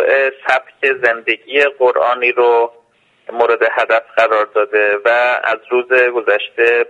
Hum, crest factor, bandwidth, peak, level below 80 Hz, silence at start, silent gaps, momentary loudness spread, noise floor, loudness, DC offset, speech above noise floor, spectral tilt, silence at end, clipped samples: none; 14 dB; 8.4 kHz; 0 dBFS; -66 dBFS; 0 s; none; 5 LU; -53 dBFS; -14 LUFS; under 0.1%; 39 dB; -3.5 dB/octave; 0.05 s; under 0.1%